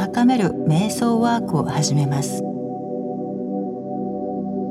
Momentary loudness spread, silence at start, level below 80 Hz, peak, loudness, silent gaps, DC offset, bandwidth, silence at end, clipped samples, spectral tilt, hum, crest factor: 10 LU; 0 s; -56 dBFS; -6 dBFS; -22 LUFS; none; under 0.1%; 14 kHz; 0 s; under 0.1%; -6 dB/octave; none; 16 dB